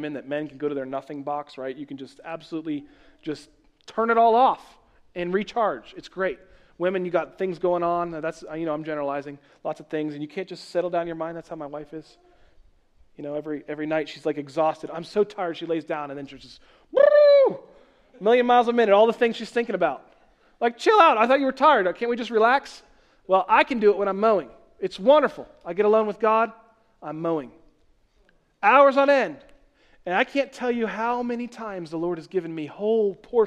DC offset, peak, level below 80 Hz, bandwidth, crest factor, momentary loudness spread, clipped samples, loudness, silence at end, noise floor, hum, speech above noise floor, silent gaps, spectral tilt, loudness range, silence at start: under 0.1%; -4 dBFS; -62 dBFS; 10 kHz; 20 dB; 18 LU; under 0.1%; -23 LUFS; 0 s; -62 dBFS; none; 39 dB; none; -5.5 dB/octave; 12 LU; 0 s